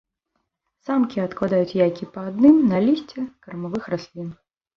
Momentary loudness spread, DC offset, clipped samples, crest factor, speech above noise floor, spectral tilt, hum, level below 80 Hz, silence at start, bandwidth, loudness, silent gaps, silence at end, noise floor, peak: 19 LU; under 0.1%; under 0.1%; 18 dB; 55 dB; -8.5 dB/octave; none; -60 dBFS; 0.9 s; 6.6 kHz; -21 LUFS; none; 0.45 s; -75 dBFS; -4 dBFS